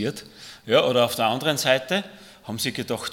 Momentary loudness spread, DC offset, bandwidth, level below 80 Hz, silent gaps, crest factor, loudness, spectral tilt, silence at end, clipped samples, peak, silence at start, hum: 21 LU; under 0.1%; 18 kHz; -64 dBFS; none; 20 dB; -22 LUFS; -3.5 dB/octave; 0 s; under 0.1%; -4 dBFS; 0 s; none